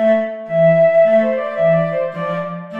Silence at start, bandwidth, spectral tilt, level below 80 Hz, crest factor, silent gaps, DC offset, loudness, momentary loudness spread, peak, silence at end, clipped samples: 0 s; 4.3 kHz; -9 dB/octave; -62 dBFS; 10 dB; none; 0.4%; -15 LUFS; 11 LU; -4 dBFS; 0 s; under 0.1%